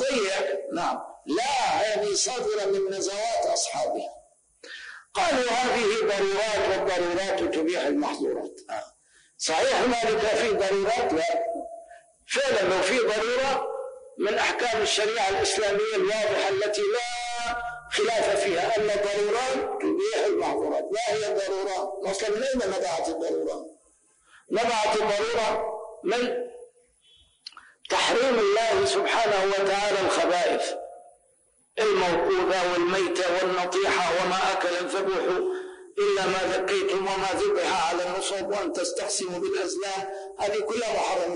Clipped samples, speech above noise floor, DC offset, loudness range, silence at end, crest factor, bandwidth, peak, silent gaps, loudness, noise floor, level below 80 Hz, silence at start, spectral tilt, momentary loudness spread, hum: under 0.1%; 39 dB; under 0.1%; 3 LU; 0 s; 12 dB; 10.5 kHz; -14 dBFS; none; -25 LUFS; -64 dBFS; -60 dBFS; 0 s; -2.5 dB/octave; 9 LU; none